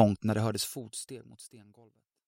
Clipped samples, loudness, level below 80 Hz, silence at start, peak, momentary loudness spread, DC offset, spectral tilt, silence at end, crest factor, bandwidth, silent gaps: under 0.1%; -32 LUFS; -66 dBFS; 0 s; -8 dBFS; 22 LU; under 0.1%; -5.5 dB/octave; 0.65 s; 24 dB; 16 kHz; none